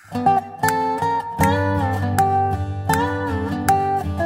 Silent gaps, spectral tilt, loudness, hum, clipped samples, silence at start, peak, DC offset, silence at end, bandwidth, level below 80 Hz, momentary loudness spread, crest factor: none; -6 dB/octave; -20 LUFS; none; under 0.1%; 0.1 s; -2 dBFS; under 0.1%; 0 s; 16 kHz; -40 dBFS; 4 LU; 18 dB